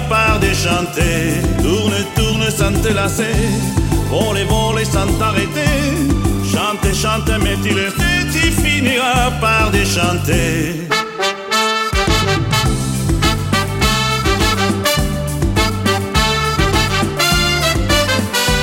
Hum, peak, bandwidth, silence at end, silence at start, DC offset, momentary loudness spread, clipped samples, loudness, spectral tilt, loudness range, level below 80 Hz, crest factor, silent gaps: none; -2 dBFS; 16.5 kHz; 0 s; 0 s; under 0.1%; 3 LU; under 0.1%; -15 LUFS; -4 dB/octave; 2 LU; -24 dBFS; 14 dB; none